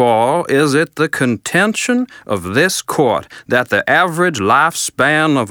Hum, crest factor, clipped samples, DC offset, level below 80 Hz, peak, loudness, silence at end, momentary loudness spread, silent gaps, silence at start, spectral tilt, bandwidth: none; 14 dB; under 0.1%; under 0.1%; -58 dBFS; 0 dBFS; -14 LUFS; 0 s; 5 LU; none; 0 s; -4 dB/octave; over 20 kHz